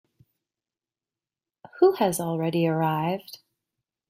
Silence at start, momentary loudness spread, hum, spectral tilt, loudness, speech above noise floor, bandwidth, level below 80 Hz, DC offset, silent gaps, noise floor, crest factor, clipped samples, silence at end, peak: 1.75 s; 10 LU; none; -6 dB/octave; -24 LUFS; over 66 dB; 16 kHz; -70 dBFS; under 0.1%; none; under -90 dBFS; 20 dB; under 0.1%; 0.75 s; -8 dBFS